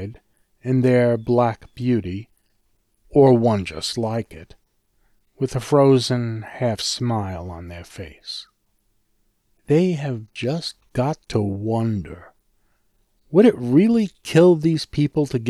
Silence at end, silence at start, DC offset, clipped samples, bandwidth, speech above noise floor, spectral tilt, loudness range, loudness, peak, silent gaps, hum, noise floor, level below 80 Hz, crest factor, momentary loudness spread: 0 s; 0 s; under 0.1%; under 0.1%; 13 kHz; 47 dB; -6.5 dB/octave; 7 LU; -20 LUFS; -4 dBFS; none; none; -66 dBFS; -50 dBFS; 18 dB; 18 LU